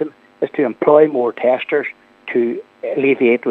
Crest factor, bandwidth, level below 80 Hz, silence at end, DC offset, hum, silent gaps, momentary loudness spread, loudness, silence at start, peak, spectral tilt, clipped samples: 16 dB; 4.2 kHz; -74 dBFS; 0 s; under 0.1%; none; none; 14 LU; -17 LUFS; 0 s; 0 dBFS; -8.5 dB/octave; under 0.1%